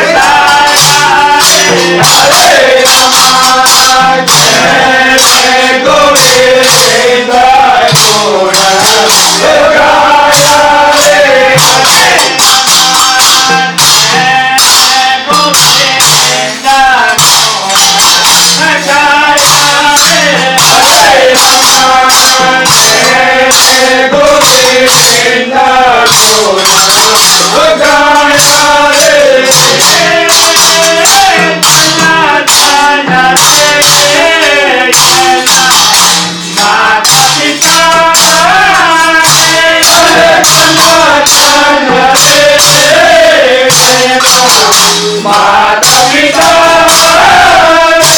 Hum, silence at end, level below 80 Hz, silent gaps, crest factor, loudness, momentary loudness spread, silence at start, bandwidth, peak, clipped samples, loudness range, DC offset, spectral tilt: none; 0 s; -38 dBFS; none; 4 dB; -3 LUFS; 3 LU; 0 s; over 20 kHz; 0 dBFS; 4%; 1 LU; under 0.1%; -1 dB/octave